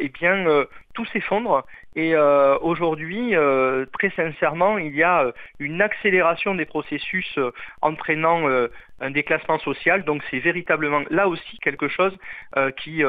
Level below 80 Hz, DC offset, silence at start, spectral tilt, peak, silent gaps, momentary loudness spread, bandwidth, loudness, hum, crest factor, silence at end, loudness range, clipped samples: -56 dBFS; 0.4%; 0 s; -8 dB/octave; -4 dBFS; none; 8 LU; 4.9 kHz; -21 LUFS; none; 18 dB; 0 s; 2 LU; under 0.1%